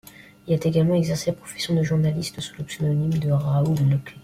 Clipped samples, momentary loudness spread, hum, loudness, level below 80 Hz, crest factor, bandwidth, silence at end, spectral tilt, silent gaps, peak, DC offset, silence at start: under 0.1%; 10 LU; none; -23 LUFS; -52 dBFS; 14 dB; 15 kHz; 0 s; -7 dB/octave; none; -8 dBFS; under 0.1%; 0.45 s